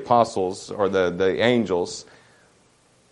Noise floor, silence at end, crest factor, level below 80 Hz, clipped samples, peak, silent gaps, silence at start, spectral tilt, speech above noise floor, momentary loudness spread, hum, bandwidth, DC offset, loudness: -59 dBFS; 1.1 s; 20 dB; -64 dBFS; under 0.1%; -4 dBFS; none; 0 s; -5 dB/octave; 38 dB; 9 LU; none; 11 kHz; under 0.1%; -22 LUFS